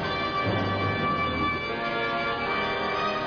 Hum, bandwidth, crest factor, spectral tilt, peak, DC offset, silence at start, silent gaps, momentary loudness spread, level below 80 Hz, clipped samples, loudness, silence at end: none; 5.4 kHz; 14 dB; -6.5 dB/octave; -14 dBFS; under 0.1%; 0 s; none; 2 LU; -48 dBFS; under 0.1%; -26 LUFS; 0 s